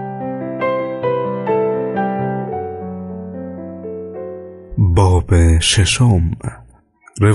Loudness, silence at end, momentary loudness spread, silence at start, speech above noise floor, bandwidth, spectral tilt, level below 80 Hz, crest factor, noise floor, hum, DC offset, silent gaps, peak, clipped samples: -17 LUFS; 0 s; 16 LU; 0 s; 35 dB; 11.5 kHz; -5.5 dB/octave; -28 dBFS; 14 dB; -48 dBFS; none; under 0.1%; none; -2 dBFS; under 0.1%